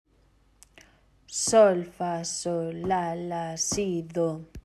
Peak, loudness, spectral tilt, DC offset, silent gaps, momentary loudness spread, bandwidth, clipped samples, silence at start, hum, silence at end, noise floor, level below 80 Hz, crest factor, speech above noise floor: -8 dBFS; -26 LUFS; -4 dB/octave; under 0.1%; none; 12 LU; 13.5 kHz; under 0.1%; 1.3 s; none; 0.05 s; -63 dBFS; -56 dBFS; 20 dB; 37 dB